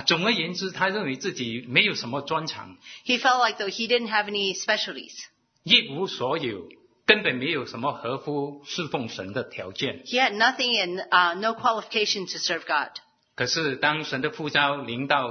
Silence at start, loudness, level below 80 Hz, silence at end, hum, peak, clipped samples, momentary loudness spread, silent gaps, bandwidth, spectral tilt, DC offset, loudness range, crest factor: 0 s; -24 LUFS; -70 dBFS; 0 s; none; -2 dBFS; under 0.1%; 12 LU; none; 6.6 kHz; -3 dB/octave; under 0.1%; 3 LU; 24 dB